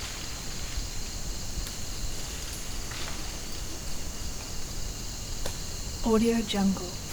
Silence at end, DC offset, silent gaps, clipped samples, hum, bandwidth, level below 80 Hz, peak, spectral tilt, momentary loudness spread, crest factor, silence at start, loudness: 0 s; under 0.1%; none; under 0.1%; none; over 20 kHz; -38 dBFS; -14 dBFS; -4 dB/octave; 10 LU; 18 dB; 0 s; -33 LUFS